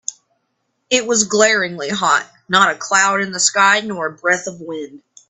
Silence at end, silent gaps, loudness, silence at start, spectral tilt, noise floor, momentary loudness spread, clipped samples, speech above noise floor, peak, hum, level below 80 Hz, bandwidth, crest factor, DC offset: 0.3 s; none; -15 LUFS; 0.1 s; -1.5 dB/octave; -70 dBFS; 15 LU; under 0.1%; 53 dB; 0 dBFS; none; -64 dBFS; 12 kHz; 18 dB; under 0.1%